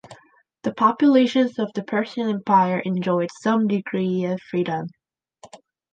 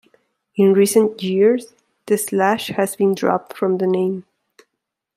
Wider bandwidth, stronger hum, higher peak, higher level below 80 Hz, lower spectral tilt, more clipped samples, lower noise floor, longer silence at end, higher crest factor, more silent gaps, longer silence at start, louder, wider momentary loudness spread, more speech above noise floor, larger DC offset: second, 9 kHz vs 16 kHz; neither; about the same, -4 dBFS vs -2 dBFS; about the same, -72 dBFS vs -68 dBFS; first, -7 dB/octave vs -5.5 dB/octave; neither; second, -56 dBFS vs -79 dBFS; second, 0.35 s vs 0.95 s; about the same, 18 dB vs 16 dB; neither; second, 0.1 s vs 0.55 s; second, -21 LUFS vs -18 LUFS; about the same, 10 LU vs 8 LU; second, 35 dB vs 62 dB; neither